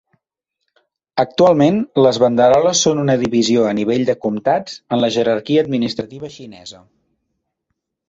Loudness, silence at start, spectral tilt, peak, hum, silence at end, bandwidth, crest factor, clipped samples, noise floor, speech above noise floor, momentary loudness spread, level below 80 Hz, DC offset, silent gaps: -15 LUFS; 1.15 s; -5 dB/octave; -2 dBFS; none; 1.35 s; 8 kHz; 16 dB; under 0.1%; -78 dBFS; 63 dB; 18 LU; -56 dBFS; under 0.1%; none